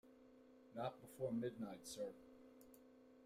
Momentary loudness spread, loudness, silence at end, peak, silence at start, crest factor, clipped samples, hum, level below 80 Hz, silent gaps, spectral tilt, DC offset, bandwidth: 22 LU; -49 LUFS; 0 s; -32 dBFS; 0.05 s; 18 dB; under 0.1%; none; -82 dBFS; none; -5.5 dB/octave; under 0.1%; 16 kHz